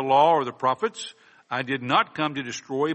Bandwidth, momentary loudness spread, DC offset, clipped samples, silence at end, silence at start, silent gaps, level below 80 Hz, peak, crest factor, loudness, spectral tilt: 8.4 kHz; 13 LU; under 0.1%; under 0.1%; 0 s; 0 s; none; -70 dBFS; -6 dBFS; 18 dB; -24 LUFS; -4.5 dB/octave